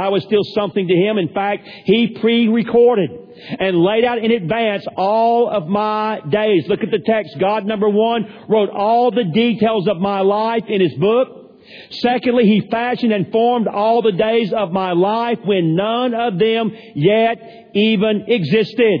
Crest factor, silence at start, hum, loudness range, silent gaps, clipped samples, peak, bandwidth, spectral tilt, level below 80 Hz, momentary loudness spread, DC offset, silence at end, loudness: 14 dB; 0 s; none; 1 LU; none; under 0.1%; -2 dBFS; 5.4 kHz; -8.5 dB/octave; -58 dBFS; 5 LU; under 0.1%; 0 s; -16 LUFS